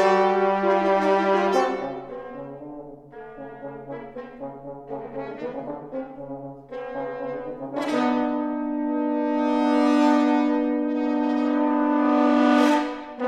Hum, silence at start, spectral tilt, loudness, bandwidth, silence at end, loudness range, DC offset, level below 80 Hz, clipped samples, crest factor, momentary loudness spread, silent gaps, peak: none; 0 s; -6 dB/octave; -22 LUFS; 9.8 kHz; 0 s; 15 LU; under 0.1%; -60 dBFS; under 0.1%; 16 dB; 18 LU; none; -8 dBFS